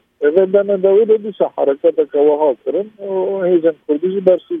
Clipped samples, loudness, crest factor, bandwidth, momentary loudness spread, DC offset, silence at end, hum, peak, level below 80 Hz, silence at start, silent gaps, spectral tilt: under 0.1%; -15 LUFS; 14 dB; 3.7 kHz; 8 LU; under 0.1%; 0 s; none; 0 dBFS; -66 dBFS; 0.2 s; none; -10 dB/octave